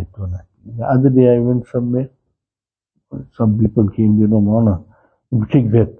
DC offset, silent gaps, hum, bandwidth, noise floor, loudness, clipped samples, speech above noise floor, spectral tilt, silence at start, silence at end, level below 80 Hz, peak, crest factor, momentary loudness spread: under 0.1%; none; none; 3.4 kHz; under -90 dBFS; -15 LUFS; under 0.1%; over 76 dB; -12.5 dB/octave; 0 s; 0.1 s; -42 dBFS; 0 dBFS; 16 dB; 18 LU